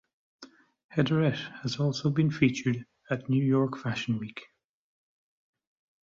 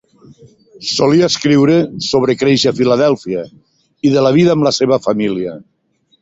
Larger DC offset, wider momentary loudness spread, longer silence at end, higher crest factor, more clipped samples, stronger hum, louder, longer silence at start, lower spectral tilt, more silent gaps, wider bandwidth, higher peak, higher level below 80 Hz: neither; about the same, 10 LU vs 11 LU; first, 1.6 s vs 0.6 s; first, 20 dB vs 14 dB; neither; neither; second, -29 LUFS vs -13 LUFS; second, 0.4 s vs 0.8 s; first, -7 dB/octave vs -5.5 dB/octave; first, 0.84-0.89 s vs none; about the same, 7.6 kHz vs 8 kHz; second, -10 dBFS vs 0 dBFS; second, -64 dBFS vs -52 dBFS